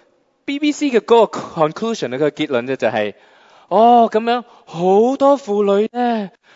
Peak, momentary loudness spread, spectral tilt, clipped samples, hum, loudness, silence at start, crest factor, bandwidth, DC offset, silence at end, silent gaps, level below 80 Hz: 0 dBFS; 10 LU; -5.5 dB/octave; under 0.1%; none; -16 LUFS; 0.5 s; 16 dB; 7.8 kHz; under 0.1%; 0.25 s; none; -68 dBFS